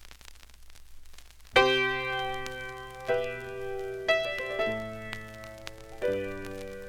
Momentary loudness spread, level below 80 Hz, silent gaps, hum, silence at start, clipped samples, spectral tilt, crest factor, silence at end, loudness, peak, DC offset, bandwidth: 19 LU; -52 dBFS; none; none; 0 s; under 0.1%; -4 dB/octave; 26 dB; 0 s; -30 LUFS; -6 dBFS; under 0.1%; 17.5 kHz